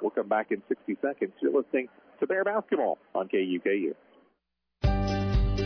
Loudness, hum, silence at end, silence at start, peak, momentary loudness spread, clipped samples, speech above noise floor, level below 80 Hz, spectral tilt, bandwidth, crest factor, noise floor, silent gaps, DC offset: -29 LUFS; none; 0 s; 0 s; -14 dBFS; 6 LU; under 0.1%; 50 dB; -36 dBFS; -8 dB/octave; 5.4 kHz; 14 dB; -79 dBFS; none; under 0.1%